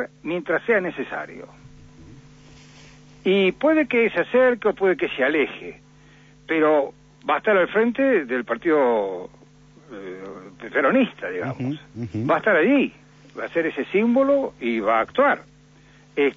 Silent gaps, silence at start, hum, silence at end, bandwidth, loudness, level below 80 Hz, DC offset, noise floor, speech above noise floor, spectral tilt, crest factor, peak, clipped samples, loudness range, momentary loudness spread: none; 0 s; 50 Hz at -55 dBFS; 0 s; 7.4 kHz; -21 LUFS; -60 dBFS; under 0.1%; -51 dBFS; 30 dB; -7 dB/octave; 14 dB; -8 dBFS; under 0.1%; 5 LU; 17 LU